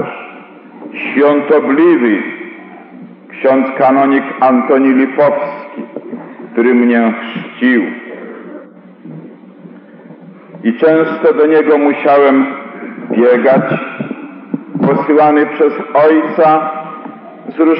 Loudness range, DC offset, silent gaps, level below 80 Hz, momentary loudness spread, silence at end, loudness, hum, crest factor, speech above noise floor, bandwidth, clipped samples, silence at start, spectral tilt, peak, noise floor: 6 LU; under 0.1%; none; -80 dBFS; 20 LU; 0 s; -11 LUFS; none; 12 dB; 26 dB; 5.2 kHz; under 0.1%; 0 s; -5 dB/octave; 0 dBFS; -35 dBFS